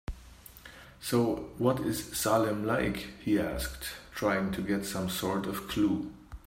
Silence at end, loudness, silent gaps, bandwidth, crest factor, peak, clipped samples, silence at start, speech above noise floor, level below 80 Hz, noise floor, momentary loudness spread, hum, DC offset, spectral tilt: 0.1 s; -31 LUFS; none; 16.5 kHz; 18 dB; -12 dBFS; under 0.1%; 0.1 s; 21 dB; -50 dBFS; -52 dBFS; 17 LU; none; under 0.1%; -5 dB/octave